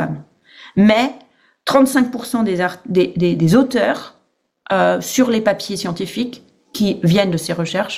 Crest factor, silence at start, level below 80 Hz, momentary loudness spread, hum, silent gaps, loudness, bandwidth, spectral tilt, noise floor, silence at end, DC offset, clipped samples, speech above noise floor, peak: 16 dB; 0 s; -52 dBFS; 11 LU; none; none; -17 LUFS; 16 kHz; -5.5 dB/octave; -63 dBFS; 0 s; under 0.1%; under 0.1%; 47 dB; -2 dBFS